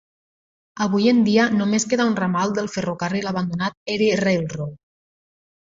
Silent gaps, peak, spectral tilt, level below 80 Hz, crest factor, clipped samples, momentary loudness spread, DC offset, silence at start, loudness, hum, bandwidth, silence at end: 3.77-3.86 s; -4 dBFS; -5 dB/octave; -58 dBFS; 16 dB; under 0.1%; 9 LU; under 0.1%; 0.75 s; -20 LUFS; none; 7.8 kHz; 0.85 s